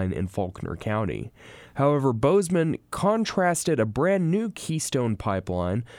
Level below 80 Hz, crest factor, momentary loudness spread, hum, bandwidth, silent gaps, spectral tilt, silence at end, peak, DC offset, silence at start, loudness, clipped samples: -50 dBFS; 16 dB; 9 LU; none; 17.5 kHz; none; -6 dB/octave; 0 s; -10 dBFS; under 0.1%; 0 s; -25 LUFS; under 0.1%